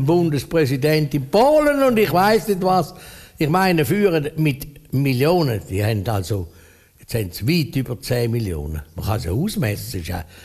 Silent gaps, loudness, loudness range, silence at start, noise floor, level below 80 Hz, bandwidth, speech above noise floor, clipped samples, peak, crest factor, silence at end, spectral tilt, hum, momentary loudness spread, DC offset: none; -20 LUFS; 6 LU; 0 s; -48 dBFS; -40 dBFS; 15 kHz; 30 dB; under 0.1%; -4 dBFS; 16 dB; 0 s; -6.5 dB/octave; none; 12 LU; under 0.1%